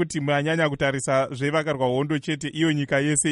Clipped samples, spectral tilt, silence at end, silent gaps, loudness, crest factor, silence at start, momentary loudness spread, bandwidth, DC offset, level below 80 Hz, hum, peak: under 0.1%; -4.5 dB/octave; 0 s; none; -23 LUFS; 14 dB; 0 s; 4 LU; 11.5 kHz; under 0.1%; -56 dBFS; none; -8 dBFS